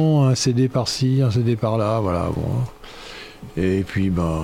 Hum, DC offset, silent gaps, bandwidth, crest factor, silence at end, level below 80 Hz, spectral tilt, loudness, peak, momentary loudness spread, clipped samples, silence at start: none; under 0.1%; none; 13 kHz; 12 dB; 0 s; -40 dBFS; -6.5 dB/octave; -20 LUFS; -8 dBFS; 18 LU; under 0.1%; 0 s